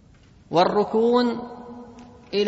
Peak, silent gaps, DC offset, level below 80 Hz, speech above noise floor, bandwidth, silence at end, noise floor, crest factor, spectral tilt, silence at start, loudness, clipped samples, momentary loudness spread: -4 dBFS; none; under 0.1%; -58 dBFS; 32 dB; 8 kHz; 0 s; -52 dBFS; 18 dB; -6.5 dB/octave; 0.5 s; -22 LUFS; under 0.1%; 21 LU